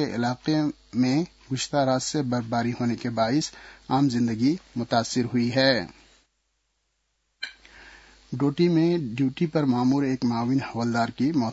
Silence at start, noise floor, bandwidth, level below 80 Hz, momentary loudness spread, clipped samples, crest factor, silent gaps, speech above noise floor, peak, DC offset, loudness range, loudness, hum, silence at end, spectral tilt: 0 s; -74 dBFS; 8 kHz; -60 dBFS; 9 LU; under 0.1%; 18 dB; none; 50 dB; -6 dBFS; under 0.1%; 4 LU; -25 LUFS; none; 0 s; -5.5 dB/octave